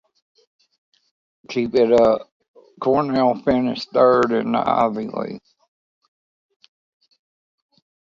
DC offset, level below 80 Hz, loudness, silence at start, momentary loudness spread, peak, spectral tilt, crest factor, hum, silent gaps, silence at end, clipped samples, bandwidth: under 0.1%; -56 dBFS; -19 LUFS; 1.5 s; 13 LU; -2 dBFS; -7 dB/octave; 20 dB; none; 2.32-2.40 s, 2.48-2.54 s; 2.8 s; under 0.1%; 7.6 kHz